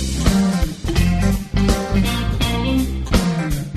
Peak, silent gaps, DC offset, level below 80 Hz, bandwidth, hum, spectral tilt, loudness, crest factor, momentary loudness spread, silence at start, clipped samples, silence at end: -2 dBFS; none; under 0.1%; -22 dBFS; 13.5 kHz; none; -5.5 dB/octave; -19 LUFS; 14 dB; 4 LU; 0 s; under 0.1%; 0 s